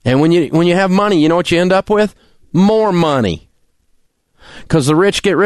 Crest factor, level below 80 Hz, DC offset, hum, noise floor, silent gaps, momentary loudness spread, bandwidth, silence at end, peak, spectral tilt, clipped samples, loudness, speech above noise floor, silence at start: 12 dB; -42 dBFS; under 0.1%; none; -56 dBFS; none; 6 LU; 12.5 kHz; 0 s; -2 dBFS; -6 dB/octave; under 0.1%; -13 LUFS; 45 dB; 0.05 s